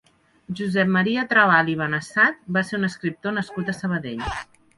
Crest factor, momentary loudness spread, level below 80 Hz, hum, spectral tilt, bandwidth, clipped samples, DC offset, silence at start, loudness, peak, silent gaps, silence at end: 20 dB; 12 LU; -50 dBFS; none; -6 dB/octave; 11.5 kHz; under 0.1%; under 0.1%; 0.5 s; -22 LUFS; -4 dBFS; none; 0.35 s